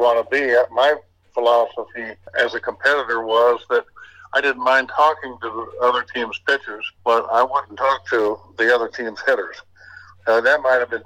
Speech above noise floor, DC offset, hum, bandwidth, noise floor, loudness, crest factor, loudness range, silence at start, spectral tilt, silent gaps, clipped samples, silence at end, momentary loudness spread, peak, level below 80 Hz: 25 dB; under 0.1%; none; 14.5 kHz; -44 dBFS; -19 LUFS; 16 dB; 2 LU; 0 s; -3.5 dB/octave; none; under 0.1%; 0.05 s; 10 LU; -4 dBFS; -64 dBFS